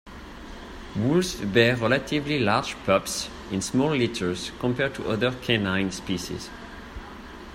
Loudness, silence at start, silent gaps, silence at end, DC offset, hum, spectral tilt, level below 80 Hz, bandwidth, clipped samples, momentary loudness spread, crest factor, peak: -25 LUFS; 0.05 s; none; 0 s; under 0.1%; none; -5 dB/octave; -48 dBFS; 16 kHz; under 0.1%; 19 LU; 22 dB; -4 dBFS